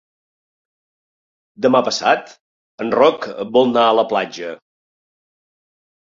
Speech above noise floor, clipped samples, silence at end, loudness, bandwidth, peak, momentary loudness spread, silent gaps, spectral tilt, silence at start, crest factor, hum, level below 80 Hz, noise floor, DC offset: over 74 dB; under 0.1%; 1.45 s; -17 LUFS; 7.6 kHz; -2 dBFS; 12 LU; 2.41-2.78 s; -4 dB/octave; 1.6 s; 18 dB; none; -64 dBFS; under -90 dBFS; under 0.1%